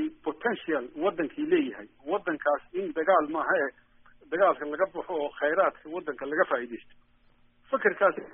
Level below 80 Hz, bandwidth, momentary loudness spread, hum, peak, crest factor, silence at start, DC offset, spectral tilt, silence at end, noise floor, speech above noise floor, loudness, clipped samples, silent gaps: -66 dBFS; 3.7 kHz; 10 LU; none; -10 dBFS; 20 dB; 0 s; under 0.1%; 1.5 dB/octave; 0 s; -62 dBFS; 34 dB; -28 LUFS; under 0.1%; none